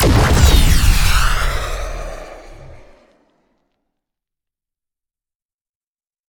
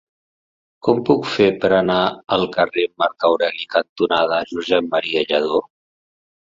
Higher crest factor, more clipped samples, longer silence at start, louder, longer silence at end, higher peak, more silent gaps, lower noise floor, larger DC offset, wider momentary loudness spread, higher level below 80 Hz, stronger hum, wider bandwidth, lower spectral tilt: about the same, 16 dB vs 18 dB; neither; second, 0 s vs 0.85 s; first, -15 LUFS vs -18 LUFS; first, 3.55 s vs 0.9 s; about the same, 0 dBFS vs 0 dBFS; second, none vs 3.89-3.96 s; about the same, under -90 dBFS vs under -90 dBFS; neither; first, 21 LU vs 5 LU; first, -20 dBFS vs -56 dBFS; neither; first, 19.5 kHz vs 7.6 kHz; second, -4.5 dB/octave vs -6 dB/octave